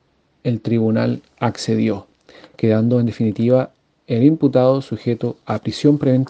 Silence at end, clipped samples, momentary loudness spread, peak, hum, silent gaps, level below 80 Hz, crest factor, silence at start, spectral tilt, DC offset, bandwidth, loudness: 0 s; under 0.1%; 9 LU; 0 dBFS; none; none; -56 dBFS; 18 dB; 0.45 s; -8 dB/octave; under 0.1%; 9 kHz; -18 LUFS